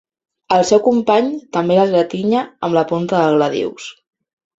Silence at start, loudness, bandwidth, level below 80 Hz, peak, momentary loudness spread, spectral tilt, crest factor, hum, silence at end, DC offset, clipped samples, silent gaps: 0.5 s; -16 LUFS; 8 kHz; -58 dBFS; 0 dBFS; 8 LU; -5.5 dB/octave; 16 dB; none; 0.65 s; under 0.1%; under 0.1%; none